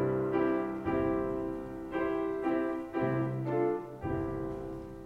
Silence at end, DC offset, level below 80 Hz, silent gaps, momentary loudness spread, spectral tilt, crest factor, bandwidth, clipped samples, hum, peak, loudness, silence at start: 0 s; under 0.1%; -54 dBFS; none; 8 LU; -9 dB/octave; 14 dB; 5.4 kHz; under 0.1%; none; -18 dBFS; -33 LUFS; 0 s